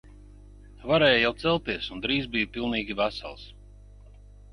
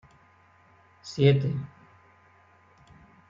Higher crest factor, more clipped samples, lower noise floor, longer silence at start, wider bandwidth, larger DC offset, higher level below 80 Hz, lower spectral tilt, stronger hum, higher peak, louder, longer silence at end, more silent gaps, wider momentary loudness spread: about the same, 22 dB vs 24 dB; neither; second, -49 dBFS vs -59 dBFS; second, 0.05 s vs 1.05 s; first, 11 kHz vs 7.4 kHz; neither; first, -48 dBFS vs -64 dBFS; second, -6 dB/octave vs -7.5 dB/octave; first, 50 Hz at -45 dBFS vs none; about the same, -8 dBFS vs -8 dBFS; about the same, -25 LUFS vs -25 LUFS; second, 1 s vs 1.65 s; neither; second, 18 LU vs 23 LU